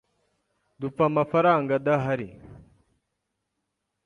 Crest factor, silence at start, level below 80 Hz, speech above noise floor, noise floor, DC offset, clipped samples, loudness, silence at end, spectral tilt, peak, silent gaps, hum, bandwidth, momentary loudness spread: 20 dB; 0.8 s; -62 dBFS; 57 dB; -80 dBFS; under 0.1%; under 0.1%; -24 LUFS; 1.5 s; -8.5 dB/octave; -8 dBFS; none; 50 Hz at -65 dBFS; 9.4 kHz; 14 LU